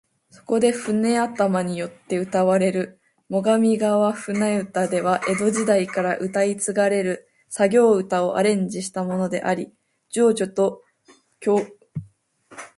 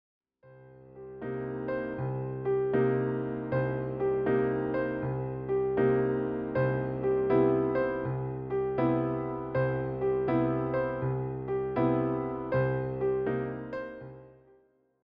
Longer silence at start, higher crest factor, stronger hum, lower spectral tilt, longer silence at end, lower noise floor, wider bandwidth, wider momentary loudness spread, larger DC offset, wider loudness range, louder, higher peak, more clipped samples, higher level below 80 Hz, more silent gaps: about the same, 0.5 s vs 0.45 s; about the same, 16 dB vs 16 dB; neither; second, -5.5 dB/octave vs -8.5 dB/octave; second, 0.1 s vs 0.75 s; second, -56 dBFS vs -65 dBFS; first, 11.5 kHz vs 5.2 kHz; about the same, 10 LU vs 9 LU; neither; about the same, 3 LU vs 3 LU; first, -21 LUFS vs -30 LUFS; first, -6 dBFS vs -14 dBFS; neither; second, -66 dBFS vs -56 dBFS; neither